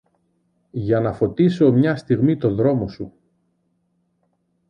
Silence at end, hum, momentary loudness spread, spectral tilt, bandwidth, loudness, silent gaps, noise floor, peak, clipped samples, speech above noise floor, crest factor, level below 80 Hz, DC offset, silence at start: 1.6 s; none; 15 LU; -9.5 dB/octave; 9.4 kHz; -19 LUFS; none; -68 dBFS; -4 dBFS; under 0.1%; 50 dB; 16 dB; -50 dBFS; under 0.1%; 0.75 s